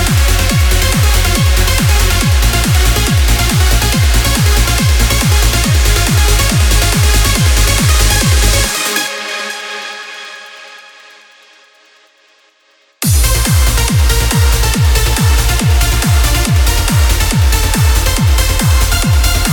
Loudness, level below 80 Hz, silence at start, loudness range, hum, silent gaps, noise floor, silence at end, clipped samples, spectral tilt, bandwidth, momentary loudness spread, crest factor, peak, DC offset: -11 LUFS; -14 dBFS; 0 s; 9 LU; none; none; -52 dBFS; 0 s; under 0.1%; -3.5 dB/octave; 19.5 kHz; 5 LU; 10 dB; 0 dBFS; under 0.1%